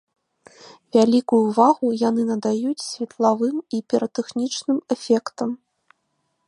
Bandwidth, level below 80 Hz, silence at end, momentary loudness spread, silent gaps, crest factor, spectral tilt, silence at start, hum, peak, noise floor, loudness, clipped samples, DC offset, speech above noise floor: 11 kHz; -72 dBFS; 0.9 s; 11 LU; none; 20 dB; -5.5 dB/octave; 0.65 s; none; -2 dBFS; -72 dBFS; -21 LUFS; under 0.1%; under 0.1%; 52 dB